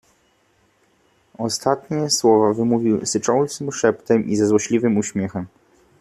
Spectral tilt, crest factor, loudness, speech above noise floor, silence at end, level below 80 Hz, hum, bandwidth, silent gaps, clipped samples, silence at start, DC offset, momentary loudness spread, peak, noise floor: -4.5 dB/octave; 18 dB; -19 LUFS; 42 dB; 0.55 s; -60 dBFS; none; 14 kHz; none; under 0.1%; 1.4 s; under 0.1%; 10 LU; -2 dBFS; -61 dBFS